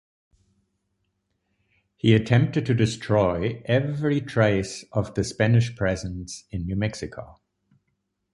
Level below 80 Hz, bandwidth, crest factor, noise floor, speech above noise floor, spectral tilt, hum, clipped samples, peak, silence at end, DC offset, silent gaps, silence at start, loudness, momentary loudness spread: -46 dBFS; 11.5 kHz; 20 dB; -76 dBFS; 53 dB; -6.5 dB/octave; none; under 0.1%; -4 dBFS; 1 s; under 0.1%; none; 2.05 s; -24 LUFS; 12 LU